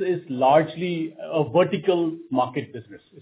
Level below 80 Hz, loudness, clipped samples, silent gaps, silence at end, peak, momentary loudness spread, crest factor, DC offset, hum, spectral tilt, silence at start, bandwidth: -68 dBFS; -23 LUFS; under 0.1%; none; 0.25 s; -6 dBFS; 12 LU; 16 dB; under 0.1%; none; -10.5 dB/octave; 0 s; 4 kHz